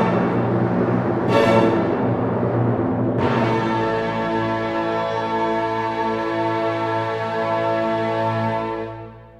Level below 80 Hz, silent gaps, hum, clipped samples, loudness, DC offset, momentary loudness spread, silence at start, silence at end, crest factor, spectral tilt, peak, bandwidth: -50 dBFS; none; none; under 0.1%; -21 LUFS; under 0.1%; 5 LU; 0 s; 0.1 s; 16 dB; -7.5 dB/octave; -4 dBFS; 10.5 kHz